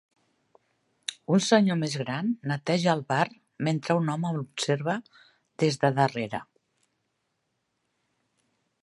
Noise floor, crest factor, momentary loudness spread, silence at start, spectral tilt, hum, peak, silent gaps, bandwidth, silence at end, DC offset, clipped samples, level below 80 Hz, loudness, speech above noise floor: -78 dBFS; 22 dB; 12 LU; 1.1 s; -5.5 dB/octave; none; -6 dBFS; none; 11.5 kHz; 2.4 s; under 0.1%; under 0.1%; -72 dBFS; -27 LUFS; 52 dB